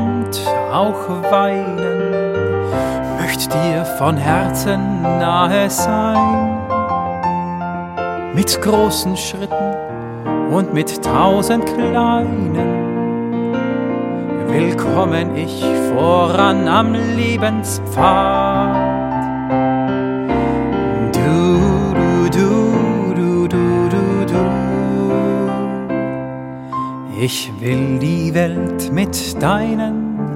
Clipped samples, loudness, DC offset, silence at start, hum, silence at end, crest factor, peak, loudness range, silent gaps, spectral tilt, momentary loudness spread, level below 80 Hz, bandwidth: under 0.1%; -16 LUFS; under 0.1%; 0 s; none; 0 s; 16 dB; 0 dBFS; 4 LU; none; -6 dB/octave; 7 LU; -38 dBFS; 16.5 kHz